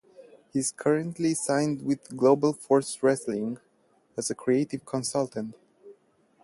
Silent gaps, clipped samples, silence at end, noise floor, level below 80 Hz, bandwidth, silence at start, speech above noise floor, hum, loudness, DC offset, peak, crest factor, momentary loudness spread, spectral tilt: none; under 0.1%; 0.5 s; -66 dBFS; -70 dBFS; 11.5 kHz; 0.2 s; 39 dB; none; -27 LUFS; under 0.1%; -8 dBFS; 20 dB; 10 LU; -5 dB/octave